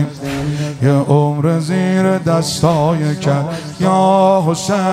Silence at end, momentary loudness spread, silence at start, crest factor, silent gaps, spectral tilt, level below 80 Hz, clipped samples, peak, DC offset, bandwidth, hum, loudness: 0 s; 8 LU; 0 s; 12 dB; none; -6.5 dB/octave; -46 dBFS; under 0.1%; -2 dBFS; under 0.1%; 14.5 kHz; none; -15 LUFS